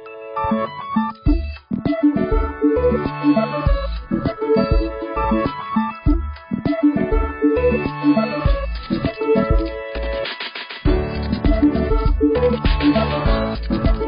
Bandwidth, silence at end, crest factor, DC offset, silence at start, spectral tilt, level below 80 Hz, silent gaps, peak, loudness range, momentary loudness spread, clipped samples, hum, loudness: 5.4 kHz; 0 s; 14 dB; under 0.1%; 0 s; -12 dB/octave; -24 dBFS; none; -6 dBFS; 2 LU; 7 LU; under 0.1%; none; -20 LUFS